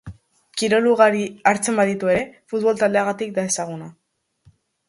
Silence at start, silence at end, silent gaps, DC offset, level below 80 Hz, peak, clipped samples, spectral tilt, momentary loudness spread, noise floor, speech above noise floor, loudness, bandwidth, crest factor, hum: 0.05 s; 0.95 s; none; under 0.1%; -56 dBFS; -2 dBFS; under 0.1%; -4 dB/octave; 10 LU; -57 dBFS; 38 dB; -20 LUFS; 11.5 kHz; 20 dB; none